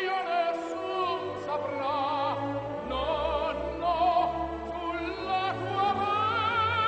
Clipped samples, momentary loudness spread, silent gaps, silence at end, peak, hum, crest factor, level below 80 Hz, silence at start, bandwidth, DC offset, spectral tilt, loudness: under 0.1%; 7 LU; none; 0 s; -16 dBFS; none; 14 dB; -50 dBFS; 0 s; 9 kHz; under 0.1%; -6 dB/octave; -29 LUFS